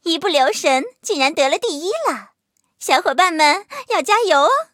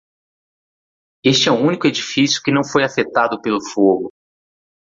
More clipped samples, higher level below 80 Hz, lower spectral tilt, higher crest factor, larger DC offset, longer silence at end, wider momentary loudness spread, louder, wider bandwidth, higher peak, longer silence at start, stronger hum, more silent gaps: neither; second, -76 dBFS vs -58 dBFS; second, -0.5 dB/octave vs -4 dB/octave; about the same, 16 dB vs 16 dB; neither; second, 0.1 s vs 0.9 s; about the same, 8 LU vs 7 LU; about the same, -17 LUFS vs -16 LUFS; first, 17 kHz vs 7.8 kHz; about the same, -2 dBFS vs -2 dBFS; second, 0.05 s vs 1.25 s; neither; neither